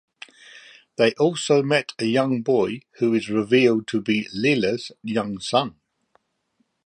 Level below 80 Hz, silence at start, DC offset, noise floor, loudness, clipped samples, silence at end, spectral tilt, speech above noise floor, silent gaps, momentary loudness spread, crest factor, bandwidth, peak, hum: -64 dBFS; 0.55 s; under 0.1%; -70 dBFS; -22 LUFS; under 0.1%; 1.15 s; -5 dB/octave; 49 dB; none; 9 LU; 18 dB; 11 kHz; -4 dBFS; none